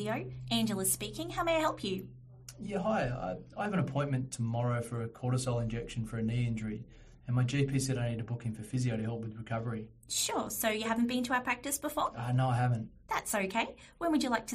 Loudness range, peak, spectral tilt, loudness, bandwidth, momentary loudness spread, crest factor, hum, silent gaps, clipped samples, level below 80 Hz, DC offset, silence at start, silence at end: 3 LU; -16 dBFS; -5 dB/octave; -34 LUFS; 15 kHz; 9 LU; 18 dB; none; none; under 0.1%; -56 dBFS; under 0.1%; 0 s; 0 s